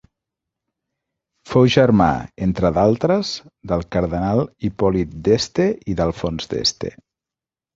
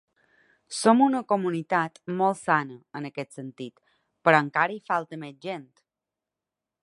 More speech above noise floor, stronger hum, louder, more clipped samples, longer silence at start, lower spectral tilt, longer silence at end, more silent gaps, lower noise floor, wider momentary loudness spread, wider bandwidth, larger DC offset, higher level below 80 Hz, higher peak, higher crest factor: first, 71 dB vs 63 dB; neither; first, -19 LUFS vs -25 LUFS; neither; first, 1.45 s vs 0.7 s; about the same, -6 dB/octave vs -5 dB/octave; second, 0.85 s vs 1.25 s; neither; about the same, -89 dBFS vs -88 dBFS; second, 10 LU vs 17 LU; second, 7.8 kHz vs 11.5 kHz; neither; first, -40 dBFS vs -78 dBFS; about the same, -2 dBFS vs -2 dBFS; second, 18 dB vs 24 dB